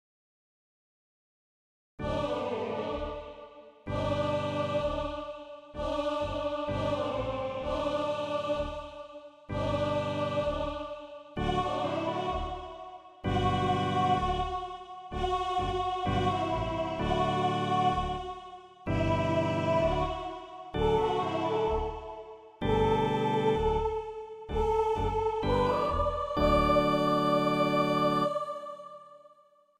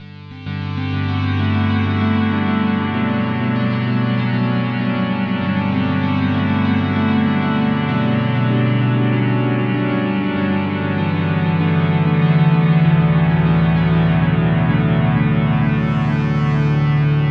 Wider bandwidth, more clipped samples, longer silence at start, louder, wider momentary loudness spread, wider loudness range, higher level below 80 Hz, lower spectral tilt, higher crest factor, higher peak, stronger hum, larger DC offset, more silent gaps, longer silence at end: first, 14 kHz vs 5.4 kHz; neither; first, 2 s vs 0 s; second, -30 LUFS vs -17 LUFS; first, 15 LU vs 5 LU; about the same, 6 LU vs 4 LU; second, -44 dBFS vs -38 dBFS; second, -6.5 dB/octave vs -9.5 dB/octave; about the same, 16 dB vs 12 dB; second, -14 dBFS vs -4 dBFS; neither; neither; neither; first, 0.6 s vs 0 s